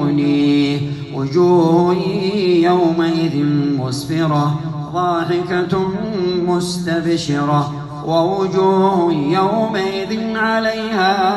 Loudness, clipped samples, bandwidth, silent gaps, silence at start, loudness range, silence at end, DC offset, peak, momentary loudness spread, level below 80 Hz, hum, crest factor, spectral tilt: -16 LUFS; under 0.1%; 12.5 kHz; none; 0 s; 3 LU; 0 s; under 0.1%; -2 dBFS; 7 LU; -50 dBFS; none; 14 dB; -6.5 dB/octave